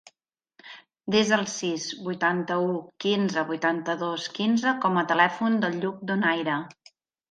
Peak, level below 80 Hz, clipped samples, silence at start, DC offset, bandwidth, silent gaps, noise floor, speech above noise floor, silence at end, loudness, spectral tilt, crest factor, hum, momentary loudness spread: -6 dBFS; -72 dBFS; under 0.1%; 0.65 s; under 0.1%; 9.2 kHz; none; -75 dBFS; 50 dB; 0.6 s; -25 LUFS; -4.5 dB/octave; 20 dB; none; 9 LU